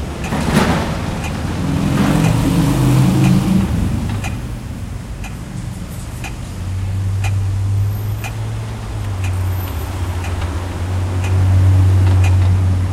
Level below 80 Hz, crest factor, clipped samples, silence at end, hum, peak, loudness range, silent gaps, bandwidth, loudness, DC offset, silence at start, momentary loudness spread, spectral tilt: -28 dBFS; 14 dB; under 0.1%; 0 s; none; -2 dBFS; 8 LU; none; 15.5 kHz; -17 LUFS; under 0.1%; 0 s; 14 LU; -6.5 dB/octave